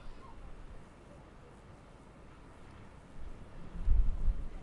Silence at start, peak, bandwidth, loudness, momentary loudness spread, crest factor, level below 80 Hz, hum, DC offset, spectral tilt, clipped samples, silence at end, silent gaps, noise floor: 0 s; -16 dBFS; 4.3 kHz; -41 LUFS; 21 LU; 20 dB; -38 dBFS; none; under 0.1%; -7.5 dB/octave; under 0.1%; 0 s; none; -54 dBFS